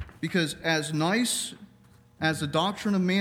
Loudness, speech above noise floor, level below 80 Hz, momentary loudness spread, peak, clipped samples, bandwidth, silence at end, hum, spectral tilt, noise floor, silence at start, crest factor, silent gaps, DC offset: -27 LUFS; 30 dB; -60 dBFS; 5 LU; -10 dBFS; under 0.1%; 17 kHz; 0 s; none; -4 dB/octave; -57 dBFS; 0 s; 16 dB; none; under 0.1%